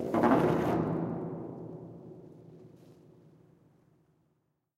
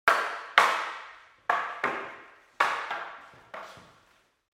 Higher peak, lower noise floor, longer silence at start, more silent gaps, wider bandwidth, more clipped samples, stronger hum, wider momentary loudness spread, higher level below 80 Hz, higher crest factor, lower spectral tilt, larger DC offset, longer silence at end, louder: second, -10 dBFS vs -2 dBFS; first, -77 dBFS vs -65 dBFS; about the same, 0 s vs 0.05 s; neither; about the same, 15.5 kHz vs 16 kHz; neither; neither; first, 26 LU vs 23 LU; first, -62 dBFS vs -72 dBFS; second, 22 dB vs 30 dB; first, -8.5 dB/octave vs -1 dB/octave; neither; first, 1.85 s vs 0.7 s; about the same, -30 LUFS vs -28 LUFS